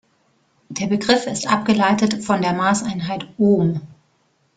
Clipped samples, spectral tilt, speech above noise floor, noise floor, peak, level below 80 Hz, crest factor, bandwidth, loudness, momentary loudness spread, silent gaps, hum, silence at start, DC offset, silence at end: under 0.1%; -5 dB/octave; 45 dB; -63 dBFS; -2 dBFS; -56 dBFS; 18 dB; 9.4 kHz; -19 LUFS; 10 LU; none; none; 0.7 s; under 0.1%; 0.65 s